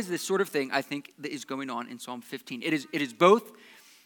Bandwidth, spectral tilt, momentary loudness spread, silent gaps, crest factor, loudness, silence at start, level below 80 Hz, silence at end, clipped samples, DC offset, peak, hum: 19 kHz; -4.5 dB/octave; 17 LU; none; 24 dB; -28 LUFS; 0 s; under -90 dBFS; 0.55 s; under 0.1%; under 0.1%; -6 dBFS; none